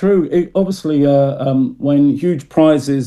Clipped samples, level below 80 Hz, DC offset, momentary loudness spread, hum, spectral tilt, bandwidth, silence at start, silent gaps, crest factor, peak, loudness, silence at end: under 0.1%; -52 dBFS; under 0.1%; 5 LU; none; -8 dB/octave; 12.5 kHz; 0 s; none; 12 dB; -2 dBFS; -14 LUFS; 0 s